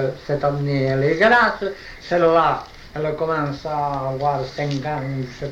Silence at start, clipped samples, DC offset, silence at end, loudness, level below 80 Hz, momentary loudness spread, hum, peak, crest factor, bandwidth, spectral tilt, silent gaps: 0 s; under 0.1%; under 0.1%; 0 s; -20 LUFS; -46 dBFS; 13 LU; none; -4 dBFS; 16 dB; 8.2 kHz; -7 dB/octave; none